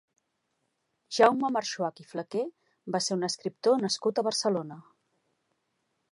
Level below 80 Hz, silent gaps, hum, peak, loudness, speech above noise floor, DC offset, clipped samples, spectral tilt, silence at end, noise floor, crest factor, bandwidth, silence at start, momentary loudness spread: -84 dBFS; none; none; -6 dBFS; -28 LUFS; 50 dB; under 0.1%; under 0.1%; -3.5 dB/octave; 1.3 s; -78 dBFS; 24 dB; 11.5 kHz; 1.1 s; 13 LU